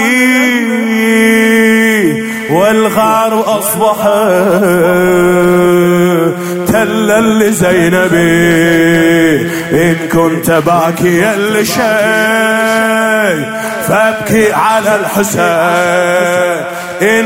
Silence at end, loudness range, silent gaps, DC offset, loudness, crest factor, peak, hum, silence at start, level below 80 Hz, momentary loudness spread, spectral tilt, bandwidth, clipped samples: 0 s; 2 LU; none; under 0.1%; -9 LUFS; 10 dB; 0 dBFS; none; 0 s; -44 dBFS; 5 LU; -5 dB/octave; 16.5 kHz; under 0.1%